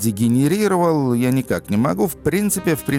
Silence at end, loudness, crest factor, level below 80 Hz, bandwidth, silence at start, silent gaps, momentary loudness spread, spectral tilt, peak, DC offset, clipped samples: 0 s; -18 LUFS; 10 dB; -48 dBFS; 17 kHz; 0 s; none; 4 LU; -6 dB/octave; -8 dBFS; under 0.1%; under 0.1%